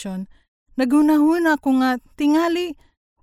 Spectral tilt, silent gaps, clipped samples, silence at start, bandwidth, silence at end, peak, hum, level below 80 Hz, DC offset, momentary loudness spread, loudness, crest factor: -5 dB/octave; 0.48-0.66 s; under 0.1%; 0 s; 15 kHz; 0.5 s; -6 dBFS; none; -56 dBFS; under 0.1%; 16 LU; -18 LUFS; 12 dB